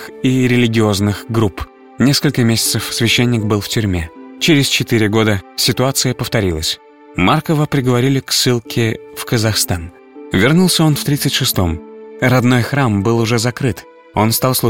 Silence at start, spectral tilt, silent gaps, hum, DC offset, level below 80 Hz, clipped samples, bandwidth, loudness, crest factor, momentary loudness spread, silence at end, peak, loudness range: 0 s; -4.5 dB/octave; none; none; 0.6%; -38 dBFS; under 0.1%; 17 kHz; -15 LUFS; 14 dB; 8 LU; 0 s; 0 dBFS; 1 LU